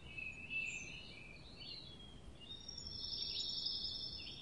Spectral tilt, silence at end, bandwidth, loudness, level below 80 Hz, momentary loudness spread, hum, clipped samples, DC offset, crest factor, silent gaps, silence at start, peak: -2 dB/octave; 0 s; 11 kHz; -43 LUFS; -62 dBFS; 15 LU; none; under 0.1%; under 0.1%; 18 dB; none; 0 s; -28 dBFS